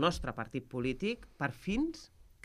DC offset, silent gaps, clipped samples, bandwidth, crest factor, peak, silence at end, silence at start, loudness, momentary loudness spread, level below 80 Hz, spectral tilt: under 0.1%; none; under 0.1%; 15 kHz; 20 dB; -16 dBFS; 0.25 s; 0 s; -37 LUFS; 5 LU; -52 dBFS; -5.5 dB/octave